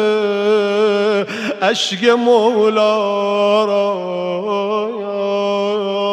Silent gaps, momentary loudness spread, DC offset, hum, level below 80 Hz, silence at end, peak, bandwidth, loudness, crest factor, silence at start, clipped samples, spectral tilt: none; 8 LU; under 0.1%; none; -74 dBFS; 0 s; 0 dBFS; 10 kHz; -16 LUFS; 16 dB; 0 s; under 0.1%; -4.5 dB/octave